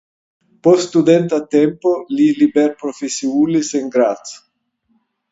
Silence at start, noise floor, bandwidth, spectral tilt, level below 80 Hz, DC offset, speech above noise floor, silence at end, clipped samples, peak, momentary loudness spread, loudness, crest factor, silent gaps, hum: 0.65 s; -65 dBFS; 8 kHz; -5.5 dB/octave; -62 dBFS; under 0.1%; 50 dB; 0.95 s; under 0.1%; 0 dBFS; 9 LU; -15 LUFS; 16 dB; none; none